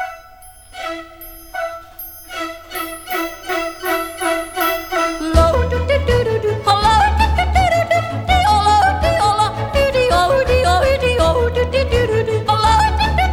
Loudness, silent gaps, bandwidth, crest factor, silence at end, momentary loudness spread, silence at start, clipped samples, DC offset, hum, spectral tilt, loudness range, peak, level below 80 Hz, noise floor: -16 LUFS; none; 17.5 kHz; 16 dB; 0 s; 14 LU; 0 s; under 0.1%; 0.1%; none; -5 dB/octave; 10 LU; 0 dBFS; -24 dBFS; -41 dBFS